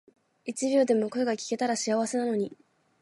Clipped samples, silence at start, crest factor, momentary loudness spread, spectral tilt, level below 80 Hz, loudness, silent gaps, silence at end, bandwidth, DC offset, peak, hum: under 0.1%; 0.45 s; 16 dB; 11 LU; -4 dB/octave; -80 dBFS; -28 LUFS; none; 0.45 s; 11.5 kHz; under 0.1%; -12 dBFS; none